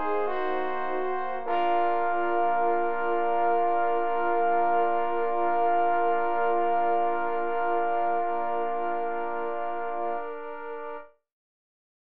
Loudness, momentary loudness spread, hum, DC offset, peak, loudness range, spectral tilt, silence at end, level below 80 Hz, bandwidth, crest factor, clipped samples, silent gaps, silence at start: -27 LUFS; 7 LU; none; 2%; -14 dBFS; 6 LU; -7.5 dB/octave; 0.7 s; -68 dBFS; 4.5 kHz; 12 dB; under 0.1%; none; 0 s